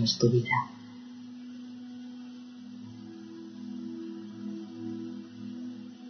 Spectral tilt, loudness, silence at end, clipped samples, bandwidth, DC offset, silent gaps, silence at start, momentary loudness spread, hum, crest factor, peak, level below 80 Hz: -4.5 dB/octave; -35 LUFS; 0 s; under 0.1%; 6.4 kHz; under 0.1%; none; 0 s; 19 LU; none; 22 dB; -12 dBFS; -72 dBFS